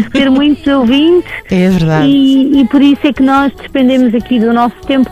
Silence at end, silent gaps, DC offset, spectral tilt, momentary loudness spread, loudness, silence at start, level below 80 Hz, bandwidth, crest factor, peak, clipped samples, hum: 0 s; none; under 0.1%; -7 dB/octave; 5 LU; -9 LUFS; 0 s; -36 dBFS; 13 kHz; 8 dB; 0 dBFS; under 0.1%; none